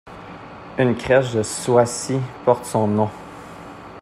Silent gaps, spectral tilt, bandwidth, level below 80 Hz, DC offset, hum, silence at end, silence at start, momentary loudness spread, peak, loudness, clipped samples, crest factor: none; -5.5 dB/octave; 15 kHz; -52 dBFS; under 0.1%; none; 0 s; 0.05 s; 20 LU; -2 dBFS; -20 LUFS; under 0.1%; 20 dB